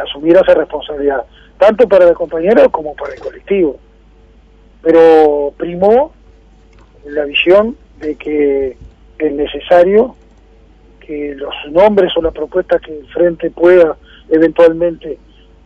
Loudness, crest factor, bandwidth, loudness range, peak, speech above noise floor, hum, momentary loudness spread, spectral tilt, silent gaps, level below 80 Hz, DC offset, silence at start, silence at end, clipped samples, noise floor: -11 LUFS; 12 dB; 6.2 kHz; 4 LU; 0 dBFS; 32 dB; none; 15 LU; -7 dB/octave; none; -40 dBFS; under 0.1%; 0 s; 0.5 s; 0.9%; -43 dBFS